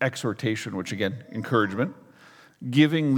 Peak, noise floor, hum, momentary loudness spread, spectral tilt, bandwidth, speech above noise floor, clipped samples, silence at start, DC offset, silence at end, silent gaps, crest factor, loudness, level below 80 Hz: -4 dBFS; -53 dBFS; none; 10 LU; -6 dB/octave; 16 kHz; 28 dB; under 0.1%; 0 s; under 0.1%; 0 s; none; 20 dB; -26 LUFS; -74 dBFS